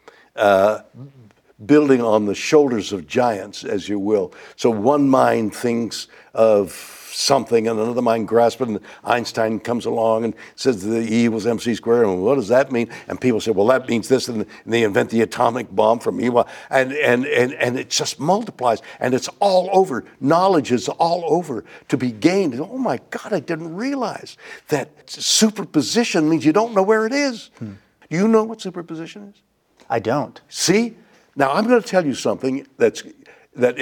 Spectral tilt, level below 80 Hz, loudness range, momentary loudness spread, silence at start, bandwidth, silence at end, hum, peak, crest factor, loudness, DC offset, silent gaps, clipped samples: -4.5 dB/octave; -64 dBFS; 3 LU; 11 LU; 0.35 s; 19 kHz; 0 s; none; -2 dBFS; 18 dB; -19 LUFS; under 0.1%; none; under 0.1%